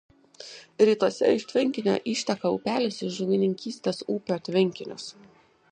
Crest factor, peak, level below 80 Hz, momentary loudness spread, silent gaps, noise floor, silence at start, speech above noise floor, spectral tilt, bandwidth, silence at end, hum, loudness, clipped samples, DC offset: 20 dB; -8 dBFS; -70 dBFS; 17 LU; none; -46 dBFS; 0.4 s; 21 dB; -5.5 dB/octave; 9.8 kHz; 0.6 s; none; -26 LUFS; under 0.1%; under 0.1%